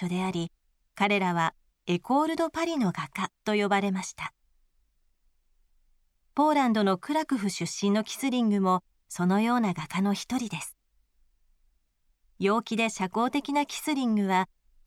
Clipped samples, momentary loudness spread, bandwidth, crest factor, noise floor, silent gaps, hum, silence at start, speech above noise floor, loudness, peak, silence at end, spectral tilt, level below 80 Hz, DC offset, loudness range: under 0.1%; 10 LU; 15.5 kHz; 16 dB; -71 dBFS; none; none; 0 s; 44 dB; -28 LUFS; -12 dBFS; 0.4 s; -5 dB/octave; -66 dBFS; under 0.1%; 5 LU